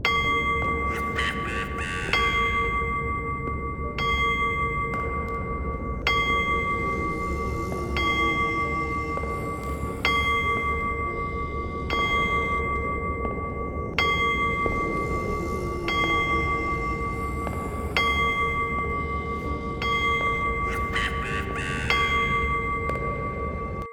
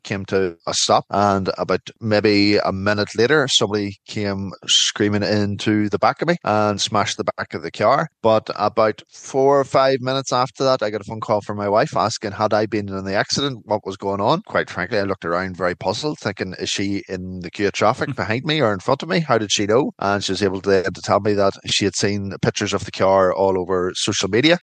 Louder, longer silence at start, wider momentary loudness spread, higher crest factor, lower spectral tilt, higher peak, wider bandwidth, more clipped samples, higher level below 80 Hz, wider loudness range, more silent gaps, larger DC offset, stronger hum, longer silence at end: second, -25 LUFS vs -19 LUFS; about the same, 0 s vs 0.05 s; about the same, 8 LU vs 9 LU; about the same, 18 dB vs 18 dB; about the same, -5 dB/octave vs -4 dB/octave; second, -6 dBFS vs 0 dBFS; first, 17.5 kHz vs 10 kHz; neither; first, -36 dBFS vs -58 dBFS; about the same, 2 LU vs 4 LU; neither; neither; neither; about the same, 0 s vs 0.05 s